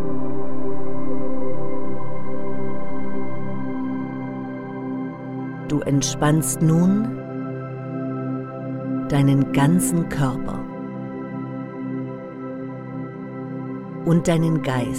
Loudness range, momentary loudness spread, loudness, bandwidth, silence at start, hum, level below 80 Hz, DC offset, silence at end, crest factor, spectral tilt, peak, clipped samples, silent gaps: 7 LU; 13 LU; -24 LUFS; 16 kHz; 0 s; none; -48 dBFS; under 0.1%; 0 s; 16 dB; -6 dB/octave; -4 dBFS; under 0.1%; none